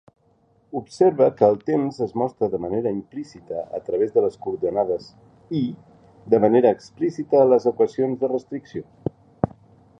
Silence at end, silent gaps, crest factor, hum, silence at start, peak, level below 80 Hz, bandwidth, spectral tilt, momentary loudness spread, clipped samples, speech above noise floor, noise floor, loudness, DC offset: 0.55 s; none; 20 dB; none; 0.75 s; -2 dBFS; -58 dBFS; 8.6 kHz; -8.5 dB/octave; 16 LU; under 0.1%; 40 dB; -61 dBFS; -22 LUFS; under 0.1%